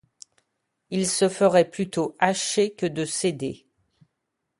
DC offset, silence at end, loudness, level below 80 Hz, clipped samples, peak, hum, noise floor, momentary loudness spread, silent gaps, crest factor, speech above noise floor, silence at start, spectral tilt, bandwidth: under 0.1%; 1.05 s; -24 LUFS; -64 dBFS; under 0.1%; -4 dBFS; none; -80 dBFS; 12 LU; none; 22 dB; 56 dB; 0.9 s; -4 dB/octave; 11.5 kHz